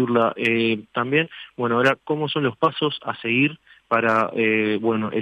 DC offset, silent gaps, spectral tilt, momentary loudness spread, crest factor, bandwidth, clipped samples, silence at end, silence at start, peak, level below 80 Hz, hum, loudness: under 0.1%; none; -7 dB/octave; 5 LU; 16 dB; 10 kHz; under 0.1%; 0 s; 0 s; -6 dBFS; -68 dBFS; none; -21 LUFS